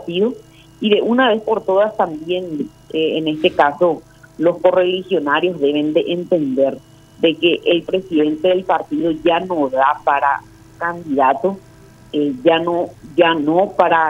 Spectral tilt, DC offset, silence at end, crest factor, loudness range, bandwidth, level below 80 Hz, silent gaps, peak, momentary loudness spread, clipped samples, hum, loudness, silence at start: -6.5 dB/octave; under 0.1%; 0 s; 16 dB; 1 LU; 11.5 kHz; -54 dBFS; none; 0 dBFS; 8 LU; under 0.1%; none; -17 LUFS; 0 s